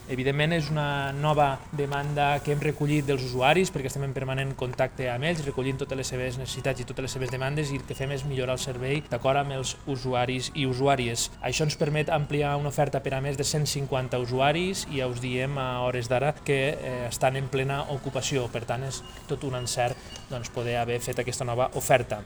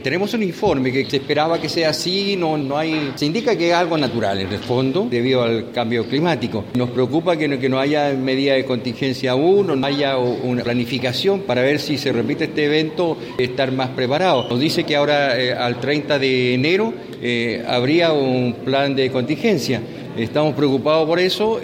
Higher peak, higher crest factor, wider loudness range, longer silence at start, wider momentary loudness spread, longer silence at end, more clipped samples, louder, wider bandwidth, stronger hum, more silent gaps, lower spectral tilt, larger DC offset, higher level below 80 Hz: about the same, -6 dBFS vs -4 dBFS; first, 22 dB vs 14 dB; first, 4 LU vs 1 LU; about the same, 0 s vs 0 s; about the same, 7 LU vs 5 LU; about the same, 0 s vs 0 s; neither; second, -28 LUFS vs -19 LUFS; first, over 20 kHz vs 16.5 kHz; neither; neither; about the same, -5 dB/octave vs -5.5 dB/octave; neither; first, -48 dBFS vs -54 dBFS